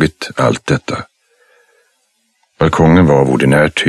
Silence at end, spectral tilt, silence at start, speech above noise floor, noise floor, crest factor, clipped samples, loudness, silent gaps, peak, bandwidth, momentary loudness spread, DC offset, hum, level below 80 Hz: 0 s; -6.5 dB/octave; 0 s; 51 dB; -62 dBFS; 14 dB; under 0.1%; -12 LUFS; none; 0 dBFS; 12.5 kHz; 8 LU; under 0.1%; none; -36 dBFS